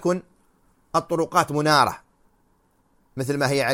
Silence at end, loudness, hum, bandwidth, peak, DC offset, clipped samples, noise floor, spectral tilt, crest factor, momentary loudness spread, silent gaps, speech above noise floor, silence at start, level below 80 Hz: 0 s; -22 LUFS; none; 16.5 kHz; -2 dBFS; under 0.1%; under 0.1%; -64 dBFS; -4.5 dB/octave; 22 dB; 13 LU; none; 42 dB; 0 s; -60 dBFS